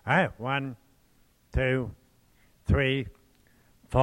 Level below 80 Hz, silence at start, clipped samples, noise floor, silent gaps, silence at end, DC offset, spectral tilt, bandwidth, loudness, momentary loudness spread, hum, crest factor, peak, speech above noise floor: -40 dBFS; 0.05 s; under 0.1%; -63 dBFS; none; 0 s; under 0.1%; -7 dB/octave; 11.5 kHz; -29 LUFS; 15 LU; none; 22 dB; -8 dBFS; 37 dB